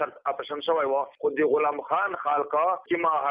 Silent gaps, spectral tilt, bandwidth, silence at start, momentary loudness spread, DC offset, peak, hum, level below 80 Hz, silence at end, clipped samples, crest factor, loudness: none; -8 dB/octave; 5 kHz; 0 s; 6 LU; under 0.1%; -12 dBFS; none; -74 dBFS; 0 s; under 0.1%; 14 dB; -26 LUFS